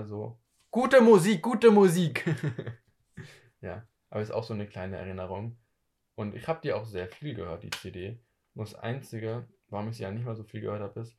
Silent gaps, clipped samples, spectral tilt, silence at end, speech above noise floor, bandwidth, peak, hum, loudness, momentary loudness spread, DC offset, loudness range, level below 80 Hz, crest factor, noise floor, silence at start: none; under 0.1%; -6.5 dB/octave; 0.1 s; 50 dB; 14.5 kHz; -6 dBFS; none; -28 LUFS; 22 LU; under 0.1%; 14 LU; -58 dBFS; 22 dB; -77 dBFS; 0 s